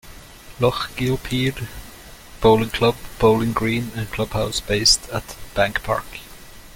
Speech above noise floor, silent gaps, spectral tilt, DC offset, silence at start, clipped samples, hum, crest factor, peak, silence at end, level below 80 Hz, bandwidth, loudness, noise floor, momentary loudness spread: 21 dB; none; -4 dB/octave; under 0.1%; 0.05 s; under 0.1%; none; 20 dB; -2 dBFS; 0.05 s; -38 dBFS; 17 kHz; -20 LUFS; -41 dBFS; 18 LU